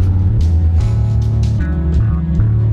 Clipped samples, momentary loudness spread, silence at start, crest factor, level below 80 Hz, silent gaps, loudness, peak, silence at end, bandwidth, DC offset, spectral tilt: under 0.1%; 2 LU; 0 s; 10 dB; -18 dBFS; none; -15 LUFS; -2 dBFS; 0 s; 7 kHz; under 0.1%; -9 dB/octave